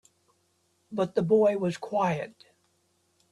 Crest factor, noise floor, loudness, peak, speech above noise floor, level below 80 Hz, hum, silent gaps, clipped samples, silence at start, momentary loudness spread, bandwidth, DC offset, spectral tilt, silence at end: 18 dB; -71 dBFS; -27 LUFS; -12 dBFS; 45 dB; -70 dBFS; none; none; under 0.1%; 0.9 s; 13 LU; 11.5 kHz; under 0.1%; -7 dB/octave; 1 s